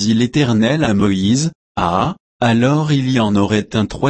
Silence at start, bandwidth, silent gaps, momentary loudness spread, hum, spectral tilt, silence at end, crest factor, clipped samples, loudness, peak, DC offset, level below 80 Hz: 0 s; 8.8 kHz; 1.55-1.75 s, 2.20-2.40 s; 5 LU; none; -6 dB/octave; 0 s; 14 dB; under 0.1%; -16 LUFS; -2 dBFS; under 0.1%; -42 dBFS